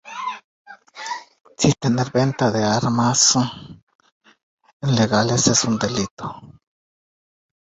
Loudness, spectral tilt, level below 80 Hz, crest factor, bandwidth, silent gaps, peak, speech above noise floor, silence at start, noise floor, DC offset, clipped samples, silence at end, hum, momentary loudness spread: -19 LUFS; -4 dB/octave; -52 dBFS; 20 dB; 8.4 kHz; 0.44-0.65 s, 3.83-3.87 s, 3.95-3.99 s, 4.12-4.21 s, 4.43-4.58 s, 4.73-4.80 s, 6.11-6.17 s; -2 dBFS; over 71 dB; 0.05 s; under -90 dBFS; under 0.1%; under 0.1%; 1.25 s; none; 18 LU